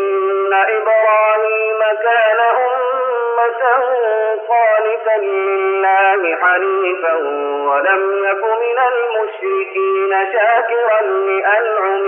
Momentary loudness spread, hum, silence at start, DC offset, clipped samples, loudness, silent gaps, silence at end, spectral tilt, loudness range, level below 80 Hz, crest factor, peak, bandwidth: 5 LU; none; 0 s; under 0.1%; under 0.1%; -14 LUFS; none; 0 s; 3 dB/octave; 2 LU; under -90 dBFS; 12 dB; -2 dBFS; 3.5 kHz